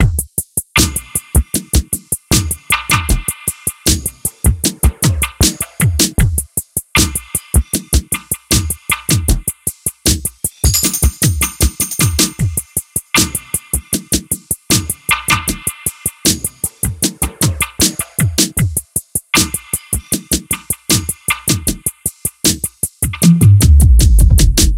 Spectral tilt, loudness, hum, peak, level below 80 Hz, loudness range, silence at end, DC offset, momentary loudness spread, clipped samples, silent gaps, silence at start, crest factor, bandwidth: -3.5 dB/octave; -14 LUFS; none; 0 dBFS; -20 dBFS; 2 LU; 0 s; under 0.1%; 8 LU; under 0.1%; none; 0 s; 14 dB; 17.5 kHz